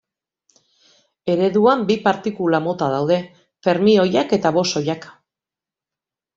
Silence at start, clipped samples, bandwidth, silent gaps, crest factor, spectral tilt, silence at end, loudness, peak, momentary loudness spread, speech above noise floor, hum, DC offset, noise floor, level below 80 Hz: 1.25 s; under 0.1%; 7.8 kHz; none; 18 dB; -5.5 dB/octave; 1.25 s; -18 LUFS; -2 dBFS; 9 LU; 71 dB; none; under 0.1%; -89 dBFS; -60 dBFS